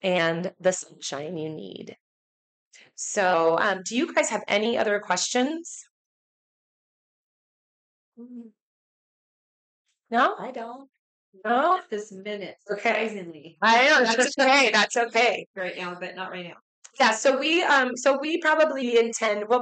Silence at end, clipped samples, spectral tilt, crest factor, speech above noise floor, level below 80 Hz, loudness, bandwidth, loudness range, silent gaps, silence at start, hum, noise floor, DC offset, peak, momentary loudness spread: 0 s; under 0.1%; -2.5 dB/octave; 14 dB; over 66 dB; -78 dBFS; -23 LUFS; 9.4 kHz; 11 LU; 2.00-2.71 s, 5.90-8.12 s, 8.61-9.85 s, 10.99-11.32 s, 15.46-15.54 s, 16.62-16.82 s; 0.05 s; none; under -90 dBFS; under 0.1%; -10 dBFS; 17 LU